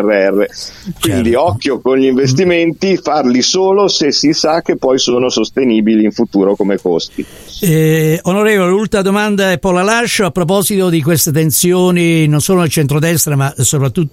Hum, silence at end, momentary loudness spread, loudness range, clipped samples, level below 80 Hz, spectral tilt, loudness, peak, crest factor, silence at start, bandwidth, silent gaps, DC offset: none; 0.05 s; 4 LU; 2 LU; under 0.1%; -42 dBFS; -4.5 dB/octave; -12 LUFS; 0 dBFS; 12 dB; 0 s; 16.5 kHz; none; under 0.1%